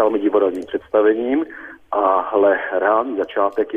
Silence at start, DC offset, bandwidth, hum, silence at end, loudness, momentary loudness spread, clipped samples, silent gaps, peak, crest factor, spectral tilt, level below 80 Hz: 0 s; under 0.1%; 3.7 kHz; none; 0 s; -18 LUFS; 8 LU; under 0.1%; none; -4 dBFS; 14 dB; -6.5 dB/octave; -58 dBFS